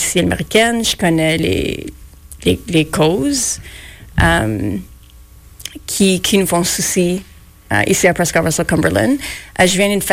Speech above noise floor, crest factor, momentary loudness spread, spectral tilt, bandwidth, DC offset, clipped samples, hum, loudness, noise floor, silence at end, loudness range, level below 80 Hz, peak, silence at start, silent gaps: 26 dB; 14 dB; 12 LU; -4 dB/octave; 16.5 kHz; under 0.1%; under 0.1%; none; -15 LUFS; -41 dBFS; 0 s; 3 LU; -34 dBFS; -2 dBFS; 0 s; none